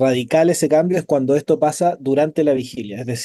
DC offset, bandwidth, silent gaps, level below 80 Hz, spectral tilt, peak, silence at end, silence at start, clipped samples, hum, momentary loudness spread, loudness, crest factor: under 0.1%; 12.5 kHz; none; -60 dBFS; -5.5 dB/octave; -4 dBFS; 0 s; 0 s; under 0.1%; none; 7 LU; -17 LUFS; 14 dB